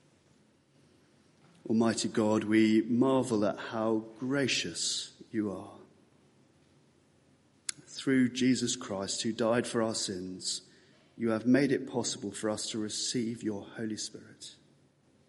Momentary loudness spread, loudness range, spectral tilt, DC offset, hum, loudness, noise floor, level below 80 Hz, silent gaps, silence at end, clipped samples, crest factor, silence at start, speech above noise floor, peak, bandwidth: 12 LU; 7 LU; -4 dB/octave; under 0.1%; none; -31 LUFS; -66 dBFS; -74 dBFS; none; 0.75 s; under 0.1%; 20 dB; 1.65 s; 36 dB; -12 dBFS; 11.5 kHz